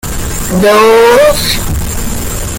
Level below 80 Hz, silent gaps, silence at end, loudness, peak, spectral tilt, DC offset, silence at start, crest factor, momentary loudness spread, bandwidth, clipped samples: -20 dBFS; none; 0 s; -9 LUFS; 0 dBFS; -4 dB/octave; under 0.1%; 0.05 s; 8 dB; 12 LU; 17.5 kHz; 0.2%